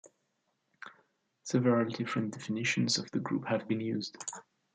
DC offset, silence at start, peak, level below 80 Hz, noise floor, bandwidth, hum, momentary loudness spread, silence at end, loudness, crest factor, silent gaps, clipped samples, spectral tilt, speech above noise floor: under 0.1%; 0.05 s; -16 dBFS; -78 dBFS; -79 dBFS; 9.6 kHz; none; 21 LU; 0.35 s; -32 LUFS; 18 dB; none; under 0.1%; -4.5 dB/octave; 47 dB